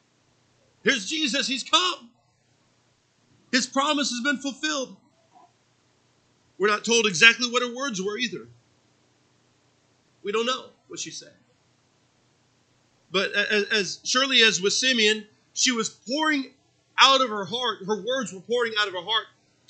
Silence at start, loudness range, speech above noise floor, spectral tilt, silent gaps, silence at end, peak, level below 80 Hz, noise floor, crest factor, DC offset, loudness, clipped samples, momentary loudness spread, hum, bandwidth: 0.85 s; 12 LU; 42 dB; -1.5 dB/octave; none; 0.45 s; 0 dBFS; -82 dBFS; -66 dBFS; 26 dB; under 0.1%; -22 LUFS; under 0.1%; 15 LU; none; 9.4 kHz